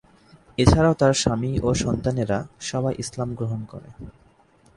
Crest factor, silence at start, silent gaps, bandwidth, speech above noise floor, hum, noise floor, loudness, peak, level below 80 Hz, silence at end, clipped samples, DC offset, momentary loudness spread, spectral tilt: 22 dB; 0.6 s; none; 11.5 kHz; 35 dB; none; -57 dBFS; -22 LUFS; 0 dBFS; -36 dBFS; 0.65 s; under 0.1%; under 0.1%; 18 LU; -5.5 dB/octave